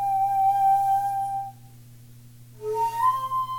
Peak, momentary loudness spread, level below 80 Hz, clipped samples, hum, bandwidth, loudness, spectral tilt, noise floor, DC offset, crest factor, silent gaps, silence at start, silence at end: -12 dBFS; 12 LU; -60 dBFS; under 0.1%; none; 17.5 kHz; -24 LUFS; -4 dB/octave; -47 dBFS; under 0.1%; 12 dB; none; 0 s; 0 s